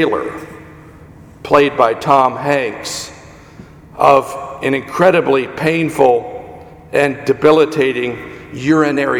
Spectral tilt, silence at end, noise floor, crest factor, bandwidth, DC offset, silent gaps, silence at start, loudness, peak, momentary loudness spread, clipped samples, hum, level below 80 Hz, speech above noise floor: -5.5 dB/octave; 0 s; -39 dBFS; 16 dB; 17.5 kHz; under 0.1%; none; 0 s; -14 LUFS; 0 dBFS; 19 LU; under 0.1%; none; -48 dBFS; 25 dB